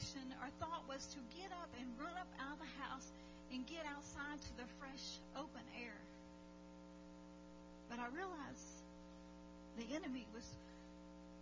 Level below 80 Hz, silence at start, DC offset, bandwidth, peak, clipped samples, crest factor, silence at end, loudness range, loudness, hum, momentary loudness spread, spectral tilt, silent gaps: -68 dBFS; 0 s; under 0.1%; 7.6 kHz; -34 dBFS; under 0.1%; 18 dB; 0 s; 3 LU; -52 LUFS; 60 Hz at -65 dBFS; 12 LU; -4 dB/octave; none